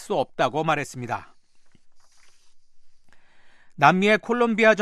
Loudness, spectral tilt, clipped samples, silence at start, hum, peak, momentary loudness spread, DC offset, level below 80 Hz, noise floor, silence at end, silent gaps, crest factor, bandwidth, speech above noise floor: -22 LUFS; -5.5 dB/octave; under 0.1%; 0 s; none; -2 dBFS; 14 LU; under 0.1%; -62 dBFS; -50 dBFS; 0 s; none; 24 dB; 13 kHz; 29 dB